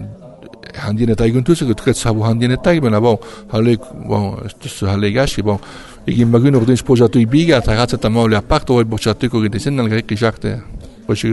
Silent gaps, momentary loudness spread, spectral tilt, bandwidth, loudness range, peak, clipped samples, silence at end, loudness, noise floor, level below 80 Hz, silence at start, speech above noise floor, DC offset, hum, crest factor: none; 12 LU; -6.5 dB/octave; 12 kHz; 4 LU; 0 dBFS; under 0.1%; 0 s; -15 LUFS; -37 dBFS; -32 dBFS; 0 s; 23 dB; under 0.1%; none; 14 dB